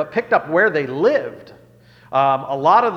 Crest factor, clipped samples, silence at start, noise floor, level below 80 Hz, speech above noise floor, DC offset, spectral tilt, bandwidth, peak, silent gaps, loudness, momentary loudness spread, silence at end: 16 dB; under 0.1%; 0 s; -48 dBFS; -62 dBFS; 31 dB; under 0.1%; -6.5 dB/octave; 7 kHz; -2 dBFS; none; -17 LUFS; 7 LU; 0 s